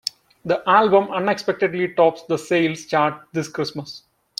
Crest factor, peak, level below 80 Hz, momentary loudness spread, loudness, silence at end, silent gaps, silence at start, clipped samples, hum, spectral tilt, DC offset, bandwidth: 20 dB; -2 dBFS; -64 dBFS; 14 LU; -20 LUFS; 0.4 s; none; 0.45 s; under 0.1%; none; -5 dB/octave; under 0.1%; 15 kHz